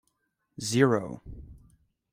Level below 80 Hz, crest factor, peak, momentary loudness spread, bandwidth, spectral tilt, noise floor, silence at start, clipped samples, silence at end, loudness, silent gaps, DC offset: -54 dBFS; 24 dB; -8 dBFS; 24 LU; 16 kHz; -5.5 dB/octave; -76 dBFS; 0.6 s; under 0.1%; 0.55 s; -26 LUFS; none; under 0.1%